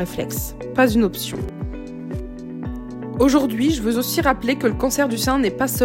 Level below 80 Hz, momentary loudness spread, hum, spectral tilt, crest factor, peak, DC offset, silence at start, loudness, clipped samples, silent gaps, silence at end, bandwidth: -36 dBFS; 14 LU; none; -4.5 dB/octave; 16 dB; -4 dBFS; under 0.1%; 0 s; -20 LUFS; under 0.1%; none; 0 s; 16.5 kHz